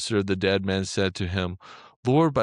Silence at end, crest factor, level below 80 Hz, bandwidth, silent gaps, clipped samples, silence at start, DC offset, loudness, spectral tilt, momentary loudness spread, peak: 0 s; 14 dB; -58 dBFS; 11 kHz; 1.96-2.03 s; under 0.1%; 0 s; under 0.1%; -25 LUFS; -5.5 dB/octave; 10 LU; -10 dBFS